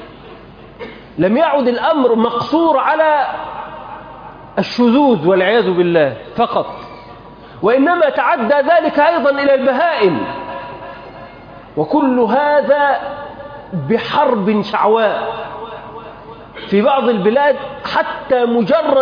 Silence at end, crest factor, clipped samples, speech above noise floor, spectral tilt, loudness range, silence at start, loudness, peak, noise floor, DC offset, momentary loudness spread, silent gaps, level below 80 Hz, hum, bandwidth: 0 s; 14 dB; under 0.1%; 24 dB; -7.5 dB/octave; 3 LU; 0 s; -14 LUFS; -2 dBFS; -37 dBFS; under 0.1%; 20 LU; none; -50 dBFS; none; 5.2 kHz